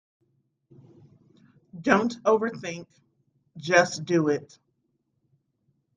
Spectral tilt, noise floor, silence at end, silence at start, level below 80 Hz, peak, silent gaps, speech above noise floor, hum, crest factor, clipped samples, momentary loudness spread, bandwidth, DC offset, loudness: -5 dB/octave; -75 dBFS; 1.55 s; 1.75 s; -70 dBFS; -6 dBFS; none; 50 dB; none; 24 dB; under 0.1%; 15 LU; 9.8 kHz; under 0.1%; -24 LUFS